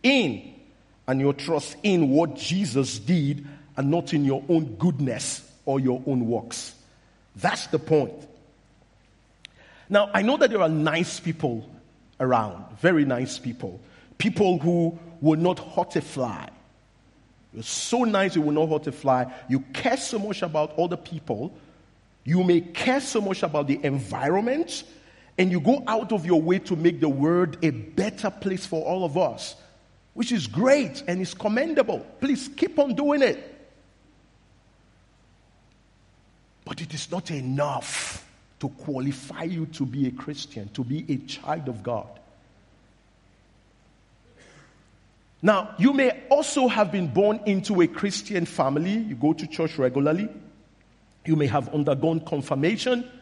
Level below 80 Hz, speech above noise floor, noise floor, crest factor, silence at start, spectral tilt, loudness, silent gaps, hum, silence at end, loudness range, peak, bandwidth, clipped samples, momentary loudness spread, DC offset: -62 dBFS; 35 dB; -59 dBFS; 22 dB; 0.05 s; -5.5 dB/octave; -25 LUFS; none; none; 0.05 s; 8 LU; -4 dBFS; 11.5 kHz; under 0.1%; 12 LU; under 0.1%